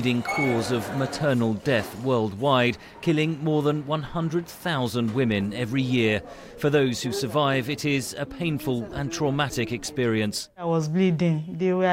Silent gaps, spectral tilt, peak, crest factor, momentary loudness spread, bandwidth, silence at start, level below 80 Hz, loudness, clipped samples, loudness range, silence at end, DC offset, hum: none; -5.5 dB/octave; -8 dBFS; 16 dB; 6 LU; 16 kHz; 0 s; -54 dBFS; -25 LUFS; under 0.1%; 2 LU; 0 s; under 0.1%; none